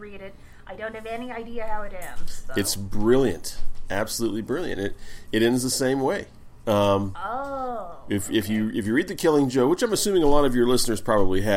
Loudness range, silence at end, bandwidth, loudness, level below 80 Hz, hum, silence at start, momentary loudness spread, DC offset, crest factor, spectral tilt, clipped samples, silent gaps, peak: 5 LU; 0 s; 16.5 kHz; -24 LUFS; -34 dBFS; none; 0 s; 15 LU; under 0.1%; 18 dB; -4.5 dB/octave; under 0.1%; none; -6 dBFS